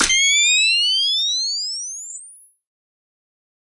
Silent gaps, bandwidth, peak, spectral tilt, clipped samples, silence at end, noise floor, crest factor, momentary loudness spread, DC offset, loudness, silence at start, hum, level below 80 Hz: none; 11.5 kHz; -2 dBFS; 3 dB/octave; under 0.1%; 1.4 s; -44 dBFS; 18 dB; 17 LU; under 0.1%; -15 LUFS; 0 s; none; -50 dBFS